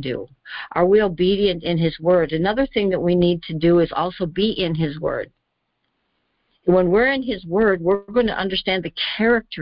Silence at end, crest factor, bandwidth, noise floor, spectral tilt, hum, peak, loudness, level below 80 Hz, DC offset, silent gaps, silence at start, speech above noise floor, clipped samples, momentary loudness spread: 0 s; 14 dB; 5.4 kHz; -73 dBFS; -11 dB/octave; none; -6 dBFS; -20 LUFS; -44 dBFS; under 0.1%; none; 0 s; 54 dB; under 0.1%; 9 LU